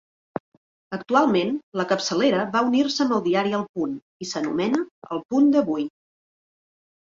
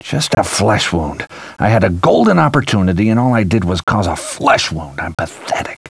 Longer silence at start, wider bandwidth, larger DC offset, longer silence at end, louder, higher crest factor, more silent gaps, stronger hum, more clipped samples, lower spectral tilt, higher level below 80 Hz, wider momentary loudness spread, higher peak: first, 0.9 s vs 0.05 s; second, 7.8 kHz vs 11 kHz; neither; first, 1.15 s vs 0.15 s; second, -23 LUFS vs -14 LUFS; first, 20 dB vs 14 dB; first, 1.63-1.72 s, 3.69-3.74 s, 4.02-4.20 s, 4.91-5.02 s, 5.25-5.29 s vs 3.83-3.87 s; neither; neither; about the same, -5 dB/octave vs -5.5 dB/octave; second, -68 dBFS vs -36 dBFS; first, 15 LU vs 11 LU; second, -4 dBFS vs 0 dBFS